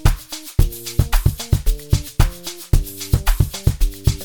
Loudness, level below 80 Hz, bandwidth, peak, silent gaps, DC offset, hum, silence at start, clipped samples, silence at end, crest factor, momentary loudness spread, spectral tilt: -21 LUFS; -20 dBFS; 19.5 kHz; -2 dBFS; none; 1%; none; 0.05 s; under 0.1%; 0 s; 16 dB; 3 LU; -5 dB/octave